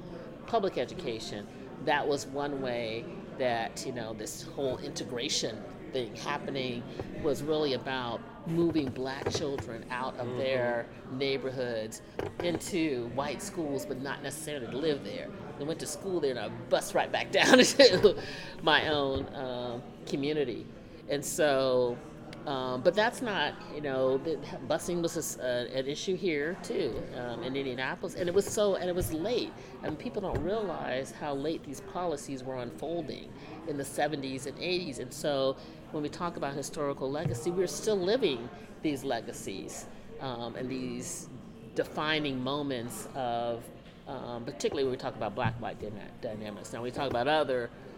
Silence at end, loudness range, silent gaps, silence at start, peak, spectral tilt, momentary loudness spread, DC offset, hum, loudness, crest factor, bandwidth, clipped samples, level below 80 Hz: 0 s; 10 LU; none; 0 s; -6 dBFS; -4 dB/octave; 12 LU; under 0.1%; none; -32 LUFS; 26 dB; 17.5 kHz; under 0.1%; -56 dBFS